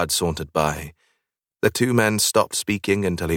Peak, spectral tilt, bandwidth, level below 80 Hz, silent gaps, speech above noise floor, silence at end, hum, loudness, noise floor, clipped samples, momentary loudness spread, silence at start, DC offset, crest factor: -4 dBFS; -4 dB/octave; 18 kHz; -44 dBFS; none; 56 dB; 0 s; none; -21 LUFS; -77 dBFS; under 0.1%; 6 LU; 0 s; under 0.1%; 18 dB